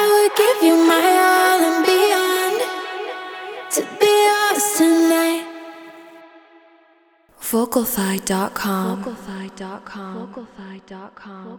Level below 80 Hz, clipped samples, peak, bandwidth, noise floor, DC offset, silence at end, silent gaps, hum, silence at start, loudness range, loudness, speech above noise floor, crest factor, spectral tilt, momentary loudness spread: -60 dBFS; under 0.1%; -2 dBFS; over 20 kHz; -55 dBFS; under 0.1%; 0 s; none; none; 0 s; 9 LU; -17 LUFS; 30 dB; 16 dB; -3 dB/octave; 23 LU